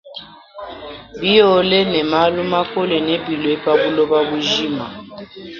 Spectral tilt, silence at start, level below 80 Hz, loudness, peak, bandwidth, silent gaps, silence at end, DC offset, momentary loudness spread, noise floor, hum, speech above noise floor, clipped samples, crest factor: -5 dB/octave; 0.05 s; -52 dBFS; -16 LUFS; 0 dBFS; 7.2 kHz; none; 0 s; under 0.1%; 21 LU; -37 dBFS; none; 21 dB; under 0.1%; 18 dB